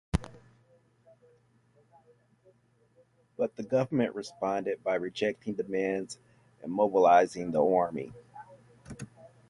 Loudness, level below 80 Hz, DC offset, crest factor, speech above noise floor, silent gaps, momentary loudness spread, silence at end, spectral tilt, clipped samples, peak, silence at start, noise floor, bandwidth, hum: -29 LUFS; -52 dBFS; under 0.1%; 22 dB; 38 dB; none; 24 LU; 0.2 s; -6.5 dB/octave; under 0.1%; -10 dBFS; 0.15 s; -66 dBFS; 11.5 kHz; none